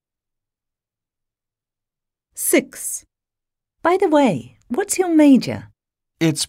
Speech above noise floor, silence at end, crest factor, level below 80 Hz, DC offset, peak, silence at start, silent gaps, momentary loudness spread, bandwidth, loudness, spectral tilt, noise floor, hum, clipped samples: 70 dB; 0.05 s; 18 dB; -62 dBFS; under 0.1%; -4 dBFS; 2.35 s; none; 15 LU; 16 kHz; -18 LUFS; -4.5 dB/octave; -87 dBFS; none; under 0.1%